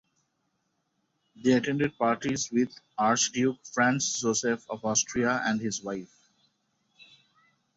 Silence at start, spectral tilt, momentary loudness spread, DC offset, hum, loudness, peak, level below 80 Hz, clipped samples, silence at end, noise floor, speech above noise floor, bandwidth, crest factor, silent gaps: 1.4 s; -3.5 dB/octave; 7 LU; under 0.1%; none; -27 LUFS; -12 dBFS; -66 dBFS; under 0.1%; 1.7 s; -77 dBFS; 49 dB; 8 kHz; 18 dB; none